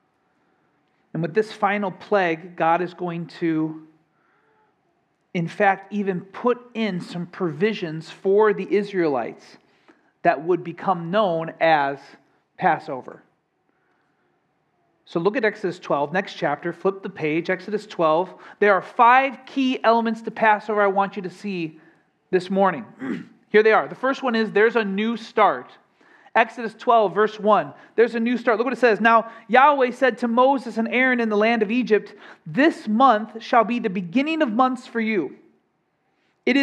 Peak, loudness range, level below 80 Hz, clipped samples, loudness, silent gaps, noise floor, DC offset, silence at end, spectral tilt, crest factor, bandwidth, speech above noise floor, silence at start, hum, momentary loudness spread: 0 dBFS; 8 LU; -80 dBFS; under 0.1%; -21 LUFS; none; -69 dBFS; under 0.1%; 0 s; -6.5 dB/octave; 22 dB; 9.8 kHz; 48 dB; 1.15 s; none; 12 LU